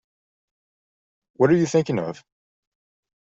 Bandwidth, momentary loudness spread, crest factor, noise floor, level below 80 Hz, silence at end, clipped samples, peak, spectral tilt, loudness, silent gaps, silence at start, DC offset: 8 kHz; 15 LU; 22 dB; under -90 dBFS; -64 dBFS; 1.2 s; under 0.1%; -4 dBFS; -6.5 dB/octave; -21 LUFS; none; 1.4 s; under 0.1%